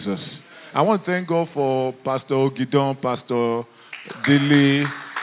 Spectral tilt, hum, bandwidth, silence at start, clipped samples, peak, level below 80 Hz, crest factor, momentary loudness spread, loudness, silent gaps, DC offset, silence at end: -10.5 dB/octave; none; 4 kHz; 0 s; under 0.1%; -2 dBFS; -68 dBFS; 18 dB; 16 LU; -21 LUFS; none; under 0.1%; 0 s